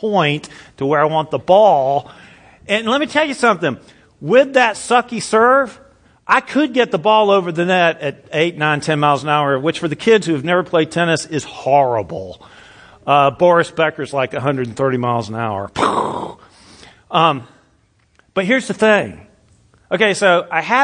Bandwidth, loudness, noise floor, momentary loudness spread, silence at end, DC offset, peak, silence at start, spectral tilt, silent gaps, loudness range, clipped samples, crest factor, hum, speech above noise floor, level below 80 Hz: 10.5 kHz; -16 LUFS; -57 dBFS; 12 LU; 0 s; under 0.1%; 0 dBFS; 0 s; -5 dB/octave; none; 4 LU; under 0.1%; 16 dB; none; 42 dB; -56 dBFS